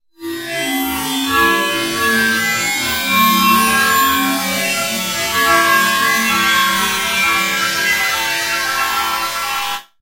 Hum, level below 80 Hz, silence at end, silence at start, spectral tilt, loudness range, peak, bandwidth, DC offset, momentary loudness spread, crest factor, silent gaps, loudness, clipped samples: none; -48 dBFS; 0.2 s; 0.2 s; -1.5 dB/octave; 2 LU; 0 dBFS; 16 kHz; under 0.1%; 7 LU; 16 dB; none; -14 LUFS; under 0.1%